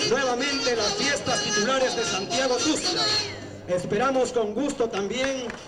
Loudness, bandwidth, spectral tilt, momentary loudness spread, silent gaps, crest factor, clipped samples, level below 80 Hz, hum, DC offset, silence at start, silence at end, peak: -24 LUFS; 15 kHz; -2.5 dB/octave; 5 LU; none; 12 dB; under 0.1%; -54 dBFS; none; under 0.1%; 0 s; 0 s; -12 dBFS